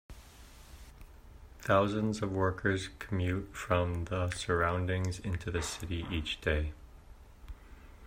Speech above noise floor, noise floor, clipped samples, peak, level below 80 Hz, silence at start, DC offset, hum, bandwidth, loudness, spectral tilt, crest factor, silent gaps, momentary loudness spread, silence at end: 21 dB; -53 dBFS; under 0.1%; -14 dBFS; -48 dBFS; 0.1 s; under 0.1%; none; 16 kHz; -33 LUFS; -5.5 dB/octave; 20 dB; none; 23 LU; 0 s